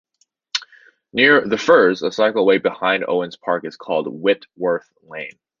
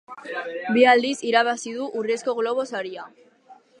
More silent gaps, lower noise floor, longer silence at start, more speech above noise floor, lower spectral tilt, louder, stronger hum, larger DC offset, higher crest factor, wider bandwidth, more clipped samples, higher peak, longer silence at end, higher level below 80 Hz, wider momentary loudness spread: neither; second, -48 dBFS vs -52 dBFS; first, 0.55 s vs 0.1 s; about the same, 30 dB vs 30 dB; first, -4.5 dB/octave vs -3 dB/octave; first, -18 LUFS vs -22 LUFS; neither; neither; about the same, 18 dB vs 20 dB; second, 7.4 kHz vs 11 kHz; neither; first, 0 dBFS vs -4 dBFS; about the same, 0.3 s vs 0.25 s; first, -64 dBFS vs -82 dBFS; about the same, 14 LU vs 15 LU